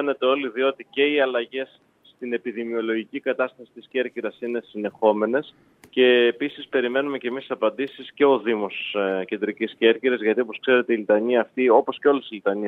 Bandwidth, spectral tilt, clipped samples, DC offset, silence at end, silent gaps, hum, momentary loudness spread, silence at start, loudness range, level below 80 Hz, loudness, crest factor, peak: 4.2 kHz; -7 dB/octave; under 0.1%; under 0.1%; 0 s; none; none; 11 LU; 0 s; 6 LU; -78 dBFS; -23 LUFS; 20 dB; -2 dBFS